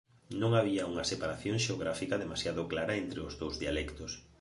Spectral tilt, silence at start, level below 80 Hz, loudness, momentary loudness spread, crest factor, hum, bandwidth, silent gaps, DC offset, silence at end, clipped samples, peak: -5 dB/octave; 0.3 s; -52 dBFS; -34 LUFS; 10 LU; 20 dB; none; 11.5 kHz; none; under 0.1%; 0.2 s; under 0.1%; -14 dBFS